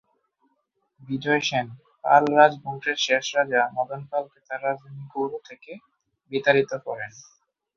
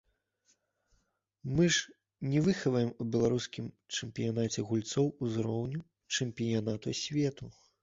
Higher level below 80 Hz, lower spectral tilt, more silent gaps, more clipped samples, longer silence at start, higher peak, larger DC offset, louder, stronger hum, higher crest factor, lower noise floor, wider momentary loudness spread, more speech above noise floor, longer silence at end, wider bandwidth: second, -70 dBFS vs -64 dBFS; about the same, -4 dB/octave vs -5 dB/octave; neither; neither; second, 1 s vs 1.45 s; first, -2 dBFS vs -16 dBFS; neither; first, -23 LUFS vs -33 LUFS; neither; about the same, 22 dB vs 18 dB; about the same, -73 dBFS vs -76 dBFS; first, 19 LU vs 12 LU; first, 50 dB vs 44 dB; first, 0.55 s vs 0.3 s; about the same, 7.6 kHz vs 7.8 kHz